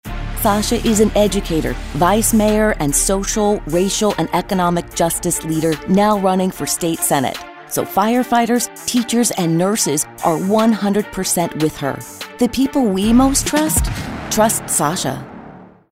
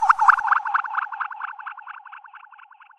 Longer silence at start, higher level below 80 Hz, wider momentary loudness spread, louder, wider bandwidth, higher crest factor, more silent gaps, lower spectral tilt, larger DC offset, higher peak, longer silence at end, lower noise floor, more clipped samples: about the same, 0.05 s vs 0 s; first, -32 dBFS vs -70 dBFS; second, 9 LU vs 24 LU; first, -16 LUFS vs -21 LUFS; first, 16.5 kHz vs 11 kHz; second, 16 dB vs 22 dB; neither; first, -4 dB/octave vs 1 dB/octave; neither; about the same, -2 dBFS vs -2 dBFS; second, 0.25 s vs 0.45 s; second, -39 dBFS vs -49 dBFS; neither